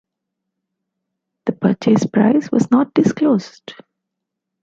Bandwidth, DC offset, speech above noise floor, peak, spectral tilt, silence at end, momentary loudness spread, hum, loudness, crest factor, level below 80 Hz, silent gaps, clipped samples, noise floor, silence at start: 7.8 kHz; under 0.1%; 64 dB; -2 dBFS; -7 dB/octave; 0.9 s; 10 LU; none; -16 LUFS; 16 dB; -58 dBFS; none; under 0.1%; -80 dBFS; 1.45 s